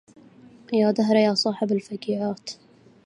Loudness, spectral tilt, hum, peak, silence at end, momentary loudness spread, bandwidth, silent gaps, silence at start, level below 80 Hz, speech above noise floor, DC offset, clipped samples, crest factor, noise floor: -23 LUFS; -5.5 dB/octave; none; -6 dBFS; 0.5 s; 15 LU; 10.5 kHz; none; 0.7 s; -72 dBFS; 27 dB; under 0.1%; under 0.1%; 18 dB; -50 dBFS